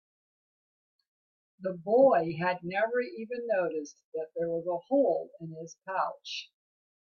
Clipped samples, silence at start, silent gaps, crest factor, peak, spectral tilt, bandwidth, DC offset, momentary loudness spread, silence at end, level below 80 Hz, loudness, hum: under 0.1%; 1.6 s; 4.04-4.12 s; 20 dB; -12 dBFS; -6 dB/octave; 7 kHz; under 0.1%; 16 LU; 0.65 s; -76 dBFS; -30 LUFS; none